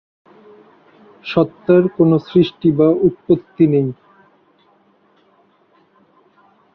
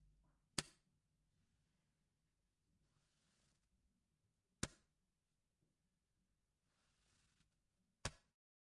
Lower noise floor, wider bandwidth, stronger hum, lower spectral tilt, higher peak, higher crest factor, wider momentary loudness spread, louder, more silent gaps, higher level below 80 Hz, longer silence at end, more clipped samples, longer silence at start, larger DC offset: second, -56 dBFS vs -90 dBFS; second, 5.6 kHz vs 11 kHz; neither; first, -10 dB/octave vs -2.5 dB/octave; first, -2 dBFS vs -22 dBFS; second, 16 dB vs 40 dB; about the same, 5 LU vs 5 LU; first, -15 LUFS vs -50 LUFS; neither; first, -56 dBFS vs -74 dBFS; first, 2.8 s vs 0.45 s; neither; first, 1.25 s vs 0.55 s; neither